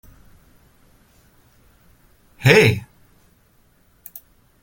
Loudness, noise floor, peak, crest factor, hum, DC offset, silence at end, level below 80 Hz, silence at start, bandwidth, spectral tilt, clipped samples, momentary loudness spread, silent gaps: -15 LUFS; -57 dBFS; 0 dBFS; 24 dB; none; under 0.1%; 1.85 s; -52 dBFS; 2.4 s; 17 kHz; -5.5 dB/octave; under 0.1%; 27 LU; none